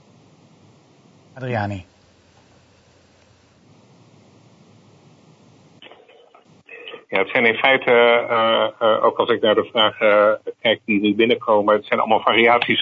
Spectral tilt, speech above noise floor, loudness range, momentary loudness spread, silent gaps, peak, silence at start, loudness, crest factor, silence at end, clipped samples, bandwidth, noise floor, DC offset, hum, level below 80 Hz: -6.5 dB/octave; 37 dB; 17 LU; 11 LU; none; -2 dBFS; 1.35 s; -17 LUFS; 18 dB; 0 s; under 0.1%; 7.4 kHz; -54 dBFS; under 0.1%; none; -66 dBFS